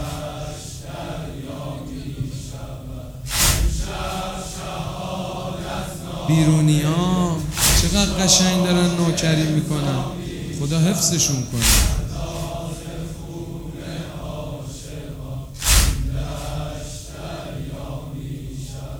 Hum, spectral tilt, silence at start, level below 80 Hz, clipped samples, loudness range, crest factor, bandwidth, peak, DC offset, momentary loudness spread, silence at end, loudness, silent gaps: none; -4 dB/octave; 0 s; -30 dBFS; under 0.1%; 11 LU; 20 dB; over 20 kHz; 0 dBFS; under 0.1%; 16 LU; 0 s; -21 LUFS; none